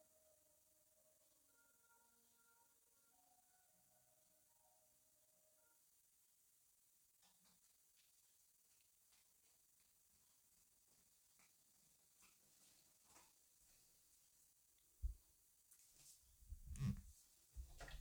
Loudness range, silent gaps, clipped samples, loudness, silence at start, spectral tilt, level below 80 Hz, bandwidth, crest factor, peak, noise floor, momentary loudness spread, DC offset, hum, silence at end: 7 LU; none; under 0.1%; -55 LUFS; 0 s; -5 dB/octave; -66 dBFS; over 20 kHz; 28 dB; -34 dBFS; -78 dBFS; 20 LU; under 0.1%; none; 0 s